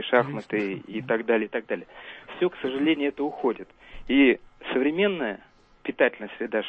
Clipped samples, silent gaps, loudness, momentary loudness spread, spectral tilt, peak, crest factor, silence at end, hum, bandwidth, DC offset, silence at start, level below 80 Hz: under 0.1%; none; -26 LUFS; 16 LU; -7.5 dB/octave; -6 dBFS; 20 dB; 0 s; none; 5.2 kHz; under 0.1%; 0 s; -56 dBFS